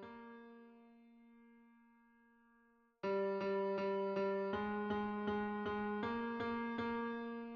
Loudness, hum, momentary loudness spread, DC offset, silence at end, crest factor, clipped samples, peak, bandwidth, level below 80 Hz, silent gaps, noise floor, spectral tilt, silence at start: -40 LUFS; none; 15 LU; under 0.1%; 0 s; 14 dB; under 0.1%; -28 dBFS; 6.4 kHz; -74 dBFS; none; -73 dBFS; -5 dB/octave; 0 s